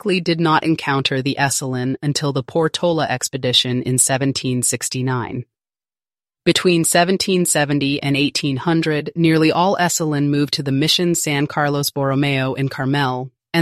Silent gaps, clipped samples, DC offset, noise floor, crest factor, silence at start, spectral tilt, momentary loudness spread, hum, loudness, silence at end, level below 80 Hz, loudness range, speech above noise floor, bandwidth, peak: none; under 0.1%; under 0.1%; under -90 dBFS; 18 dB; 0.05 s; -4 dB/octave; 6 LU; none; -18 LUFS; 0 s; -56 dBFS; 2 LU; over 72 dB; 15 kHz; 0 dBFS